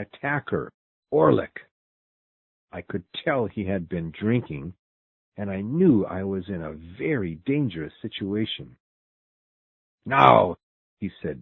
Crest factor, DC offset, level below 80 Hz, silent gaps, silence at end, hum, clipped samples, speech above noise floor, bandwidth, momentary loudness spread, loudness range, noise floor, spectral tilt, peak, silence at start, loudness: 26 dB; under 0.1%; -52 dBFS; 0.74-1.03 s, 1.71-2.67 s, 4.79-5.32 s, 8.80-9.98 s, 10.63-10.97 s; 0 s; none; under 0.1%; over 66 dB; 6.2 kHz; 17 LU; 6 LU; under -90 dBFS; -9 dB/octave; 0 dBFS; 0 s; -24 LUFS